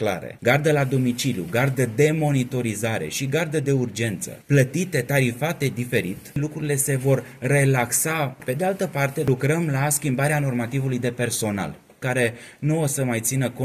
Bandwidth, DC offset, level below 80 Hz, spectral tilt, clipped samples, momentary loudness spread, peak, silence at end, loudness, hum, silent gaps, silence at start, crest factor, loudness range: 15 kHz; under 0.1%; -54 dBFS; -5 dB/octave; under 0.1%; 6 LU; -4 dBFS; 0 s; -23 LUFS; none; none; 0 s; 20 dB; 2 LU